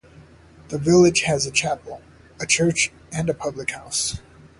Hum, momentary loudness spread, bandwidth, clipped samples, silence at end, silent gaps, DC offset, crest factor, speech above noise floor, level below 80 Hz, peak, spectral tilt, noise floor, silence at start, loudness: none; 17 LU; 11.5 kHz; under 0.1%; 0.4 s; none; under 0.1%; 20 dB; 27 dB; -48 dBFS; -4 dBFS; -3.5 dB/octave; -48 dBFS; 0.2 s; -21 LUFS